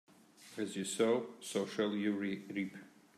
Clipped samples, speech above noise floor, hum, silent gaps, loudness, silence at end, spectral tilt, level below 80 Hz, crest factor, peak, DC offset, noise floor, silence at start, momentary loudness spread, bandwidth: under 0.1%; 23 dB; none; none; -37 LUFS; 0.3 s; -4.5 dB/octave; -86 dBFS; 18 dB; -20 dBFS; under 0.1%; -60 dBFS; 0.4 s; 11 LU; 14.5 kHz